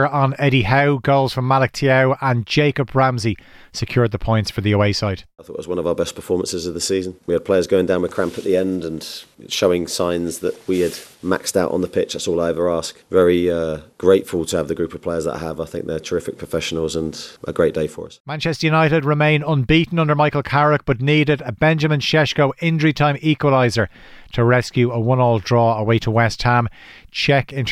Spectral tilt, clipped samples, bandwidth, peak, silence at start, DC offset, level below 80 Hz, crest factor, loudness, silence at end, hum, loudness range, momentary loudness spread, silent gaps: -5.5 dB/octave; under 0.1%; 15 kHz; -2 dBFS; 0 s; under 0.1%; -44 dBFS; 16 dB; -18 LUFS; 0 s; none; 5 LU; 10 LU; 18.20-18.25 s